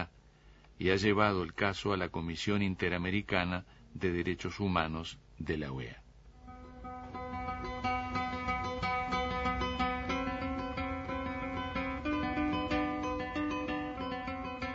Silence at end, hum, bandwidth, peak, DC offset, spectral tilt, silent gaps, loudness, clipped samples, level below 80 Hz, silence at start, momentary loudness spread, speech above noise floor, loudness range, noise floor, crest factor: 0 s; none; 7.6 kHz; -10 dBFS; under 0.1%; -4 dB/octave; none; -34 LUFS; under 0.1%; -50 dBFS; 0 s; 11 LU; 26 dB; 6 LU; -59 dBFS; 24 dB